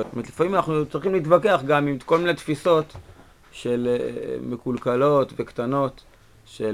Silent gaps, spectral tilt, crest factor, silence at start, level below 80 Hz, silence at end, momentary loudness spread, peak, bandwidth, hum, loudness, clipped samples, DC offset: none; -6.5 dB/octave; 20 dB; 0 s; -54 dBFS; 0 s; 11 LU; -4 dBFS; 16 kHz; none; -23 LUFS; under 0.1%; 0.1%